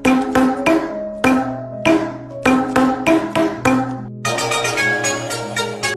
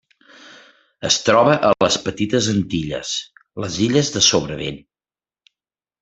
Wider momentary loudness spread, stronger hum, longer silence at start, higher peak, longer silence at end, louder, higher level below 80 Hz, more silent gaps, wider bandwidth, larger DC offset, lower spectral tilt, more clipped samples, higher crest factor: second, 7 LU vs 15 LU; neither; second, 0 s vs 0.45 s; about the same, -2 dBFS vs -2 dBFS; second, 0 s vs 1.25 s; about the same, -17 LUFS vs -18 LUFS; first, -46 dBFS vs -52 dBFS; neither; first, 14 kHz vs 8.4 kHz; neither; about the same, -4 dB/octave vs -3.5 dB/octave; neither; about the same, 14 dB vs 18 dB